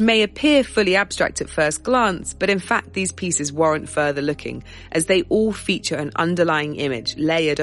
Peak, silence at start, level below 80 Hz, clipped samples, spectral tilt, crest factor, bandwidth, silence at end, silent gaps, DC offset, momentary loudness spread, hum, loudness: -4 dBFS; 0 s; -46 dBFS; under 0.1%; -4 dB/octave; 16 dB; 11.5 kHz; 0 s; none; under 0.1%; 7 LU; none; -20 LUFS